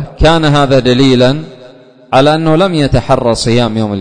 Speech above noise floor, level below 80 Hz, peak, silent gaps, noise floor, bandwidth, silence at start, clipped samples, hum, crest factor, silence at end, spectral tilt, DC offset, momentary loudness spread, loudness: 28 dB; -26 dBFS; 0 dBFS; none; -37 dBFS; 9.6 kHz; 0 s; 0.2%; none; 10 dB; 0 s; -6 dB/octave; 2%; 5 LU; -10 LUFS